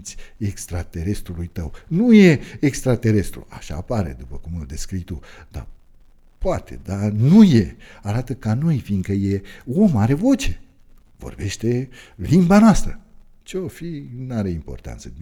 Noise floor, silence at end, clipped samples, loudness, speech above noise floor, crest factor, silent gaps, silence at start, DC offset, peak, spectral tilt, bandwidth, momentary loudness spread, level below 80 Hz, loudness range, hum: -48 dBFS; 0 s; under 0.1%; -19 LUFS; 29 dB; 18 dB; none; 0 s; under 0.1%; -2 dBFS; -7 dB/octave; 15 kHz; 22 LU; -34 dBFS; 8 LU; none